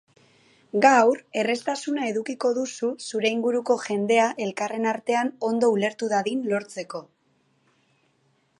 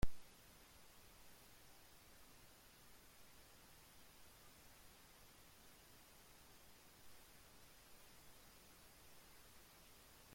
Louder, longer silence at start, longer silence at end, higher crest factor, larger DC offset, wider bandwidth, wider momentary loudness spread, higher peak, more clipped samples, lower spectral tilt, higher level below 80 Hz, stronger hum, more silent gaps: first, -24 LUFS vs -63 LUFS; first, 0.75 s vs 0 s; first, 1.55 s vs 0 s; second, 20 dB vs 26 dB; neither; second, 11.5 kHz vs 16.5 kHz; first, 9 LU vs 1 LU; first, -4 dBFS vs -24 dBFS; neither; about the same, -4 dB/octave vs -4 dB/octave; second, -80 dBFS vs -62 dBFS; neither; neither